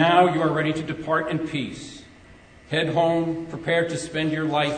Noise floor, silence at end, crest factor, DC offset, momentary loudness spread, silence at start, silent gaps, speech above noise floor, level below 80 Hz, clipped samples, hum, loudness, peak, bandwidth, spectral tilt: -49 dBFS; 0 s; 20 dB; under 0.1%; 10 LU; 0 s; none; 26 dB; -56 dBFS; under 0.1%; none; -24 LUFS; -4 dBFS; 9.4 kHz; -5.5 dB/octave